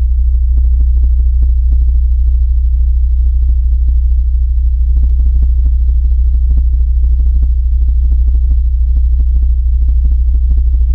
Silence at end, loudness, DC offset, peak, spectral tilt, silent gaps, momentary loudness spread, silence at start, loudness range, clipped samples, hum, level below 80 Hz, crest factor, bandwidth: 0 s; -13 LUFS; under 0.1%; -2 dBFS; -11.5 dB/octave; none; 1 LU; 0 s; 0 LU; under 0.1%; none; -8 dBFS; 6 dB; 0.6 kHz